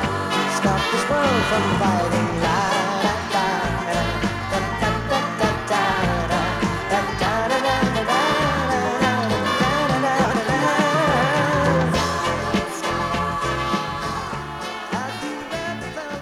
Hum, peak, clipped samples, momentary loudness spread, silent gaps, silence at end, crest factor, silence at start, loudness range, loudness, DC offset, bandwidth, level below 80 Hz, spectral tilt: none; -6 dBFS; under 0.1%; 8 LU; none; 0 s; 14 dB; 0 s; 4 LU; -21 LUFS; under 0.1%; 16 kHz; -38 dBFS; -4.5 dB/octave